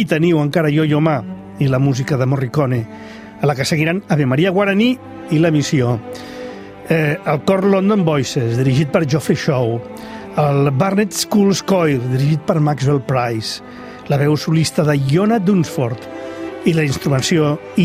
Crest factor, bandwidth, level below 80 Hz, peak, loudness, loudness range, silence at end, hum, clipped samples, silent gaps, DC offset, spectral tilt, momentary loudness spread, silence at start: 14 dB; 15.5 kHz; -50 dBFS; -2 dBFS; -16 LUFS; 1 LU; 0 s; none; under 0.1%; none; under 0.1%; -6 dB/octave; 13 LU; 0 s